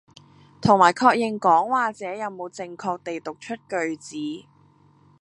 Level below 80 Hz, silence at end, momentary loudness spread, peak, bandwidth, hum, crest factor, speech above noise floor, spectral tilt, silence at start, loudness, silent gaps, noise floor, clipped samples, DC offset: -60 dBFS; 0.8 s; 17 LU; -2 dBFS; 11 kHz; none; 22 dB; 34 dB; -5 dB/octave; 0.6 s; -22 LUFS; none; -56 dBFS; under 0.1%; under 0.1%